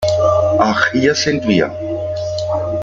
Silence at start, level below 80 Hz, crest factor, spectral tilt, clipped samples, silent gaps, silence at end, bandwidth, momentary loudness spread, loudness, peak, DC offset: 0 s; -46 dBFS; 14 dB; -5 dB/octave; under 0.1%; none; 0 s; 7.6 kHz; 8 LU; -16 LUFS; -2 dBFS; under 0.1%